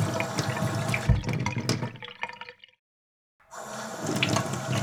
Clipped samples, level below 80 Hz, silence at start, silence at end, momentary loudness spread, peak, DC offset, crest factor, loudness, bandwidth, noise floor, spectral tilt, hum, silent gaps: under 0.1%; -42 dBFS; 0 s; 0 s; 14 LU; -8 dBFS; under 0.1%; 22 dB; -29 LUFS; 19 kHz; under -90 dBFS; -4.5 dB/octave; none; 2.79-3.39 s